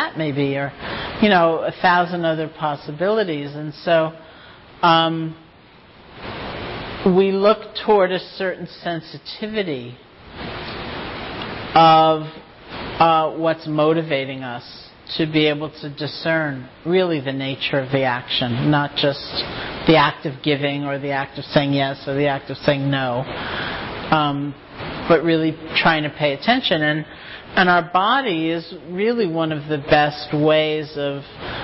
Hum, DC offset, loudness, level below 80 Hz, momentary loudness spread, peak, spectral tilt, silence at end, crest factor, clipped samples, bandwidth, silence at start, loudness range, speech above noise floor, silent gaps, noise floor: none; under 0.1%; -20 LUFS; -48 dBFS; 14 LU; -4 dBFS; -10 dB/octave; 0 s; 16 dB; under 0.1%; 5.8 kHz; 0 s; 4 LU; 28 dB; none; -47 dBFS